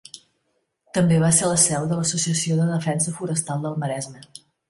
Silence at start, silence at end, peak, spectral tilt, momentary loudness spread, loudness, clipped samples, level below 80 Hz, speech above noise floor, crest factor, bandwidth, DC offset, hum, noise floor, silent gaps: 0.15 s; 0.5 s; -4 dBFS; -4.5 dB/octave; 11 LU; -21 LUFS; under 0.1%; -58 dBFS; 50 dB; 18 dB; 11.5 kHz; under 0.1%; none; -72 dBFS; none